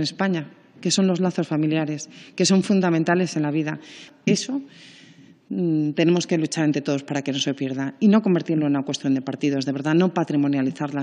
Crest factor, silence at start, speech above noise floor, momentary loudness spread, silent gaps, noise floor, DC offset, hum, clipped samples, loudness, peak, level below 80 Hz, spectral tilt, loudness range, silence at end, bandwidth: 16 dB; 0 s; 28 dB; 10 LU; none; -49 dBFS; under 0.1%; none; under 0.1%; -22 LUFS; -6 dBFS; -78 dBFS; -5.5 dB/octave; 3 LU; 0 s; 10.5 kHz